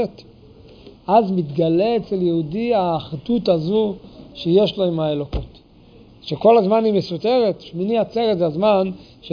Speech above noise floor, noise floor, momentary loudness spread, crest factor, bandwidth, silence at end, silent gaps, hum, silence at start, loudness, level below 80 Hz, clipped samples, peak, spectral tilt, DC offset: 29 dB; -47 dBFS; 13 LU; 16 dB; 5.2 kHz; 0 s; none; none; 0 s; -19 LUFS; -44 dBFS; under 0.1%; -2 dBFS; -8.5 dB/octave; under 0.1%